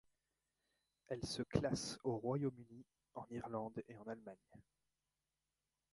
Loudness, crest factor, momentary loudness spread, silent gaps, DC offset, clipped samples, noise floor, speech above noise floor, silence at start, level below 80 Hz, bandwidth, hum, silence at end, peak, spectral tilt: -44 LUFS; 24 dB; 19 LU; none; under 0.1%; under 0.1%; under -90 dBFS; over 46 dB; 1.1 s; -68 dBFS; 11.5 kHz; none; 1.3 s; -24 dBFS; -5.5 dB/octave